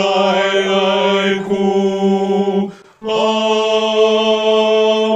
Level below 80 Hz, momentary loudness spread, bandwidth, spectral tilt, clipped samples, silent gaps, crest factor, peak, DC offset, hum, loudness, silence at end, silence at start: -58 dBFS; 5 LU; 8.8 kHz; -5 dB/octave; under 0.1%; none; 12 dB; -2 dBFS; under 0.1%; none; -14 LUFS; 0 s; 0 s